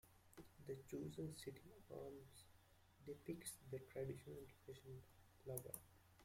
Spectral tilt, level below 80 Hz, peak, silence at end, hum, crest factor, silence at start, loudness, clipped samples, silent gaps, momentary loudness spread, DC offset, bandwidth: -5.5 dB/octave; -76 dBFS; -28 dBFS; 0 s; none; 28 dB; 0.05 s; -55 LUFS; under 0.1%; none; 12 LU; under 0.1%; 16.5 kHz